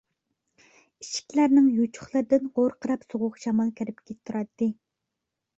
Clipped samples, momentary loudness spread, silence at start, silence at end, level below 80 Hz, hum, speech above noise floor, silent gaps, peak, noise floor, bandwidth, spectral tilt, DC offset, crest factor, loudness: under 0.1%; 15 LU; 1 s; 0.85 s; -68 dBFS; none; 60 dB; none; -8 dBFS; -84 dBFS; 8 kHz; -5.5 dB/octave; under 0.1%; 18 dB; -26 LUFS